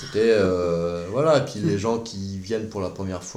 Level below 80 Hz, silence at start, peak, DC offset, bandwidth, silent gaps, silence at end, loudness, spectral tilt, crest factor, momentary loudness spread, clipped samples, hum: -54 dBFS; 0 s; -6 dBFS; under 0.1%; 12 kHz; none; 0 s; -23 LUFS; -6 dB/octave; 16 dB; 11 LU; under 0.1%; none